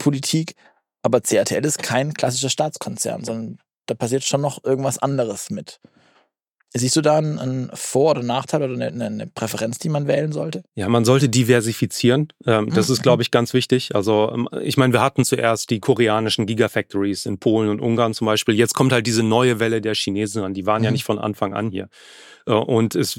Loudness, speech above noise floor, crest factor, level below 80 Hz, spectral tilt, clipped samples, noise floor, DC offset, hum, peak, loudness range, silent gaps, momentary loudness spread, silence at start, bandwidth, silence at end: -20 LUFS; 48 dB; 18 dB; -62 dBFS; -5 dB/octave; under 0.1%; -67 dBFS; under 0.1%; none; -2 dBFS; 5 LU; none; 10 LU; 0 s; 17 kHz; 0 s